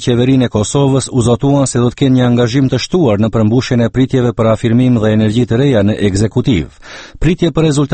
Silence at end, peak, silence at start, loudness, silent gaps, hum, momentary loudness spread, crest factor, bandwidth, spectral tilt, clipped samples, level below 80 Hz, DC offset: 0 s; 0 dBFS; 0 s; -12 LUFS; none; none; 3 LU; 12 dB; 8.8 kHz; -6.5 dB/octave; under 0.1%; -32 dBFS; under 0.1%